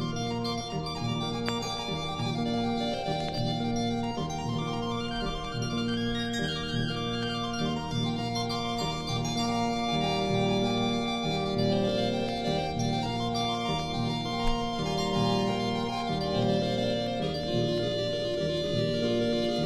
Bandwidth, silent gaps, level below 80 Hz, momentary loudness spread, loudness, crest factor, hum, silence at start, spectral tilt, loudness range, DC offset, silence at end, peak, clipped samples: 14.5 kHz; none; -46 dBFS; 5 LU; -30 LUFS; 20 dB; none; 0 s; -5.5 dB/octave; 3 LU; under 0.1%; 0 s; -10 dBFS; under 0.1%